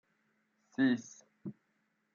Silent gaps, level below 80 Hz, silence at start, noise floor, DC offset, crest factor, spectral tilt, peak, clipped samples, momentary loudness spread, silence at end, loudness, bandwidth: none; -90 dBFS; 0.8 s; -79 dBFS; under 0.1%; 20 dB; -5.5 dB/octave; -20 dBFS; under 0.1%; 18 LU; 0.65 s; -34 LUFS; 7.2 kHz